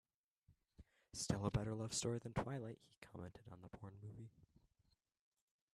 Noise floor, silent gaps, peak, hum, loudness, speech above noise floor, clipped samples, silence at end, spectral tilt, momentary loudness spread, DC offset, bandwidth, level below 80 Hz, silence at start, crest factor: -82 dBFS; 2.98-3.02 s; -24 dBFS; none; -46 LUFS; 36 dB; under 0.1%; 1.3 s; -5 dB/octave; 18 LU; under 0.1%; 13 kHz; -66 dBFS; 0.5 s; 24 dB